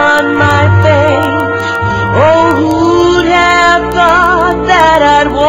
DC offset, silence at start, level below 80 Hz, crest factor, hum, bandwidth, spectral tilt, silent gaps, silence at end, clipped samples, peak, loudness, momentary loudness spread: under 0.1%; 0 s; -30 dBFS; 8 dB; none; 16 kHz; -5.5 dB/octave; none; 0 s; 0.3%; 0 dBFS; -8 LUFS; 6 LU